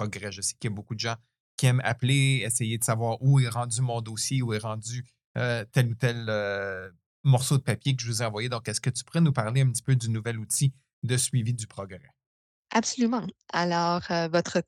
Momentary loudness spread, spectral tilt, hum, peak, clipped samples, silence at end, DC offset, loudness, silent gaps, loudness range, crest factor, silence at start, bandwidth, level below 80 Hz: 11 LU; -5 dB/octave; none; -8 dBFS; under 0.1%; 0.05 s; under 0.1%; -27 LUFS; 1.40-1.58 s, 5.24-5.35 s, 7.06-7.24 s, 10.93-11.02 s, 12.26-12.63 s; 3 LU; 20 dB; 0 s; 15.5 kHz; -66 dBFS